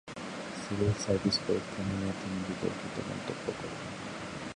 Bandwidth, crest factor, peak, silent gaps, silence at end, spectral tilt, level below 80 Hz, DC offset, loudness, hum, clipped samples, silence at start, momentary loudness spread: 11.5 kHz; 18 dB; -16 dBFS; none; 0 s; -5 dB/octave; -54 dBFS; under 0.1%; -34 LUFS; none; under 0.1%; 0.05 s; 10 LU